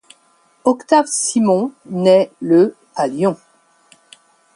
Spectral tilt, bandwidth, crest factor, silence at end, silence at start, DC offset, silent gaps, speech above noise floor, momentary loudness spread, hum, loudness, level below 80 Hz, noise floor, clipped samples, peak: -5 dB/octave; 11.5 kHz; 16 dB; 1.2 s; 0.65 s; under 0.1%; none; 41 dB; 8 LU; none; -16 LUFS; -66 dBFS; -56 dBFS; under 0.1%; 0 dBFS